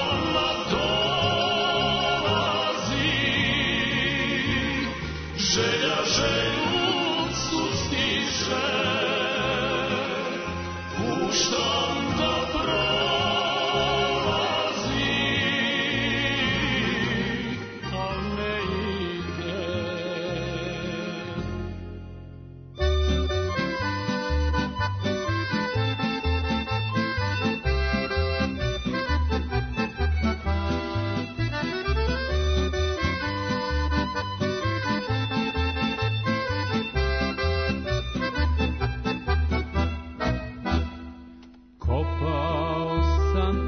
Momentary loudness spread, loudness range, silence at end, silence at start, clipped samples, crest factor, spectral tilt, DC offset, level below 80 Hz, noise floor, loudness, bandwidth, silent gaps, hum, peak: 8 LU; 6 LU; 0 s; 0 s; under 0.1%; 16 dB; -4.5 dB/octave; under 0.1%; -34 dBFS; -48 dBFS; -25 LUFS; 6.6 kHz; none; none; -10 dBFS